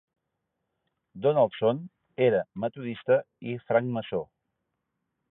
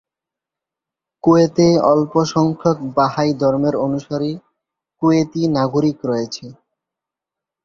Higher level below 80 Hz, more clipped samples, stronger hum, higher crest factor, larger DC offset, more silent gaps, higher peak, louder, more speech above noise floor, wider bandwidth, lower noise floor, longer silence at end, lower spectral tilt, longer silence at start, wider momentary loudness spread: second, -70 dBFS vs -54 dBFS; neither; neither; about the same, 18 dB vs 16 dB; neither; neither; second, -10 dBFS vs -2 dBFS; second, -27 LUFS vs -17 LUFS; second, 55 dB vs 70 dB; second, 4 kHz vs 7.4 kHz; second, -82 dBFS vs -86 dBFS; about the same, 1.05 s vs 1.1 s; first, -10.5 dB/octave vs -7 dB/octave; about the same, 1.15 s vs 1.25 s; first, 13 LU vs 10 LU